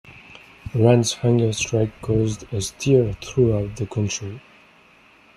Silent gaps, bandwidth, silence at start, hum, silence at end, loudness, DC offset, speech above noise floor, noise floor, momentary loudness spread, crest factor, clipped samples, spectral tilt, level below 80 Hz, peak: none; 12.5 kHz; 0.05 s; none; 0.95 s; -21 LUFS; under 0.1%; 32 dB; -52 dBFS; 12 LU; 20 dB; under 0.1%; -6 dB/octave; -46 dBFS; -2 dBFS